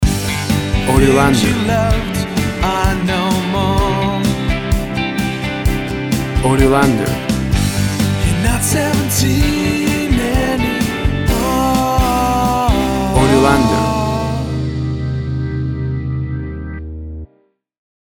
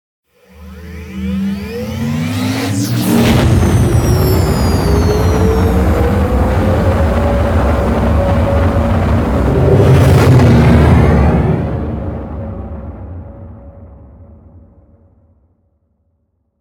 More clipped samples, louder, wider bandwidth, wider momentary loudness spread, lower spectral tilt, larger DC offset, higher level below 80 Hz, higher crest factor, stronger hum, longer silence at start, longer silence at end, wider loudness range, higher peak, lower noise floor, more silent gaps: neither; second, -15 LUFS vs -12 LUFS; about the same, 19.5 kHz vs 19.5 kHz; second, 9 LU vs 17 LU; second, -5.5 dB/octave vs -7 dB/octave; neither; about the same, -24 dBFS vs -20 dBFS; about the same, 14 dB vs 12 dB; neither; second, 0 s vs 0.6 s; second, 0.8 s vs 2.35 s; second, 4 LU vs 10 LU; about the same, 0 dBFS vs 0 dBFS; second, -57 dBFS vs -63 dBFS; neither